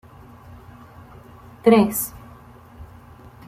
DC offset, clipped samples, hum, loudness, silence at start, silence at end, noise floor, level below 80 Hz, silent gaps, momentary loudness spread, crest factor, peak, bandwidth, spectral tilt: under 0.1%; under 0.1%; none; -19 LUFS; 1.65 s; 0.65 s; -45 dBFS; -52 dBFS; none; 28 LU; 22 dB; -2 dBFS; 16 kHz; -5.5 dB/octave